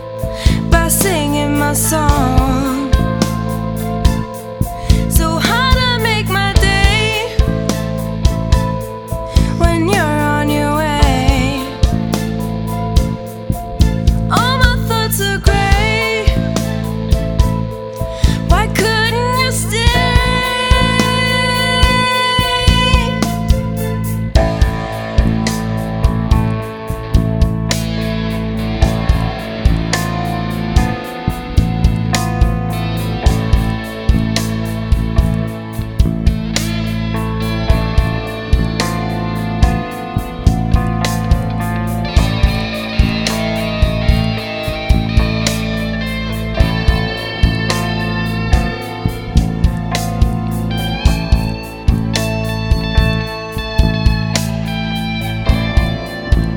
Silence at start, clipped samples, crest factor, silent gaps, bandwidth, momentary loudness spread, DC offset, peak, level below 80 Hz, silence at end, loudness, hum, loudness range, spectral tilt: 0 s; 0.2%; 14 dB; none; over 20 kHz; 7 LU; under 0.1%; 0 dBFS; -18 dBFS; 0 s; -16 LUFS; none; 4 LU; -5 dB/octave